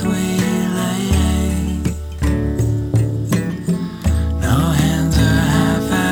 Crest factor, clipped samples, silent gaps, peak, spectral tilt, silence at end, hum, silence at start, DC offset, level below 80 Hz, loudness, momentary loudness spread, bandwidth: 14 dB; under 0.1%; none; -2 dBFS; -6 dB/octave; 0 s; none; 0 s; under 0.1%; -26 dBFS; -18 LUFS; 6 LU; over 20 kHz